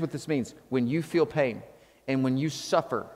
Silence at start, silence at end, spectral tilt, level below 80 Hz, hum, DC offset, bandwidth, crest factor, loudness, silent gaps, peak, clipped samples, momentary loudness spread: 0 s; 0 s; -6 dB/octave; -66 dBFS; none; under 0.1%; 15.5 kHz; 20 dB; -28 LUFS; none; -10 dBFS; under 0.1%; 5 LU